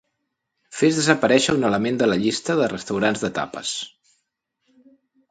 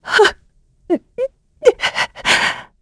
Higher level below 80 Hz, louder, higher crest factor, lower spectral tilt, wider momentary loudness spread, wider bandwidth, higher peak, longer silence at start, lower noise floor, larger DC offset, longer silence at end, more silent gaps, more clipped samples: second, -58 dBFS vs -50 dBFS; second, -21 LUFS vs -17 LUFS; about the same, 22 dB vs 18 dB; first, -4 dB/octave vs -2 dB/octave; about the same, 10 LU vs 11 LU; second, 9.6 kHz vs 11 kHz; about the same, 0 dBFS vs 0 dBFS; first, 0.7 s vs 0.05 s; first, -77 dBFS vs -54 dBFS; neither; first, 1.4 s vs 0.2 s; neither; neither